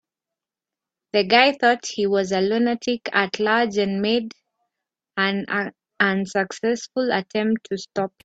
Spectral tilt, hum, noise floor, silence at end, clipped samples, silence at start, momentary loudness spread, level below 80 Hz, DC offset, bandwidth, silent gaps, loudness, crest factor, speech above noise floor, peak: -4.5 dB/octave; none; -88 dBFS; 0.15 s; under 0.1%; 1.15 s; 9 LU; -66 dBFS; under 0.1%; 8 kHz; none; -21 LUFS; 22 dB; 67 dB; 0 dBFS